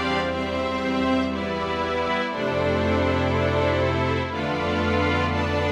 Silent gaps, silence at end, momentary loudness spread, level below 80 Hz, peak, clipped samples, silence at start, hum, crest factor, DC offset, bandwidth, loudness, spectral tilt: none; 0 s; 4 LU; -40 dBFS; -10 dBFS; under 0.1%; 0 s; none; 14 dB; under 0.1%; 10 kHz; -23 LUFS; -6.5 dB/octave